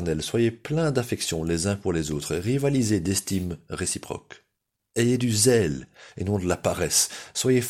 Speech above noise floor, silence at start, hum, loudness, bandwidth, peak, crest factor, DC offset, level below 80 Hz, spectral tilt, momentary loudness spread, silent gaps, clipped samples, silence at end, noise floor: 54 dB; 0 s; none; -25 LUFS; 16.5 kHz; -6 dBFS; 18 dB; under 0.1%; -48 dBFS; -4.5 dB/octave; 11 LU; none; under 0.1%; 0 s; -79 dBFS